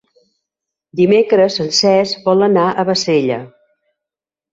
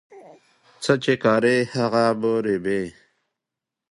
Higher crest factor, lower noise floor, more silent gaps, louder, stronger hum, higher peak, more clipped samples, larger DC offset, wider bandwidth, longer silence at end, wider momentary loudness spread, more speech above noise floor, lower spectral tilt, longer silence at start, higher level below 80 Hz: second, 14 dB vs 20 dB; about the same, -87 dBFS vs -86 dBFS; neither; first, -14 LUFS vs -21 LUFS; neither; about the same, -2 dBFS vs -2 dBFS; neither; neither; second, 8 kHz vs 11.5 kHz; about the same, 1.05 s vs 1 s; about the same, 6 LU vs 8 LU; first, 73 dB vs 66 dB; about the same, -4.5 dB/octave vs -5.5 dB/octave; first, 0.95 s vs 0.1 s; about the same, -60 dBFS vs -62 dBFS